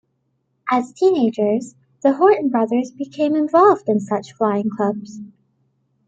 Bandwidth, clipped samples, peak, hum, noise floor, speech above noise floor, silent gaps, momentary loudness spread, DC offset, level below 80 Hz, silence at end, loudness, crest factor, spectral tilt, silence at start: 8.6 kHz; under 0.1%; -2 dBFS; none; -69 dBFS; 51 dB; none; 15 LU; under 0.1%; -66 dBFS; 0.8 s; -18 LUFS; 18 dB; -7 dB/octave; 0.65 s